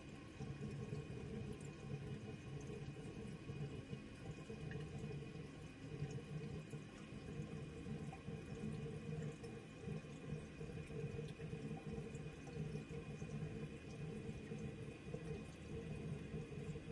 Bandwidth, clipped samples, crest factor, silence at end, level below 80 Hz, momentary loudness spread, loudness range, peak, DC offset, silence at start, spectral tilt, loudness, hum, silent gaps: 11.5 kHz; under 0.1%; 18 dB; 0 s; -64 dBFS; 4 LU; 1 LU; -32 dBFS; under 0.1%; 0 s; -7 dB/octave; -51 LUFS; none; none